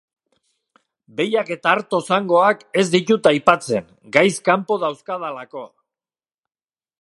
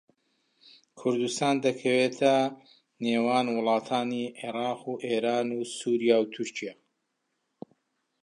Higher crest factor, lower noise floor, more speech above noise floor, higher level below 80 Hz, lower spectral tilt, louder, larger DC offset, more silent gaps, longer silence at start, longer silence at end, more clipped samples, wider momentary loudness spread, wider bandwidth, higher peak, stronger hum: about the same, 20 dB vs 20 dB; first, under -90 dBFS vs -79 dBFS; first, over 72 dB vs 52 dB; first, -64 dBFS vs -82 dBFS; about the same, -4.5 dB/octave vs -4.5 dB/octave; first, -18 LUFS vs -28 LUFS; neither; neither; first, 1.15 s vs 0.95 s; second, 1.35 s vs 1.5 s; neither; first, 13 LU vs 10 LU; about the same, 11.5 kHz vs 11.5 kHz; first, 0 dBFS vs -8 dBFS; neither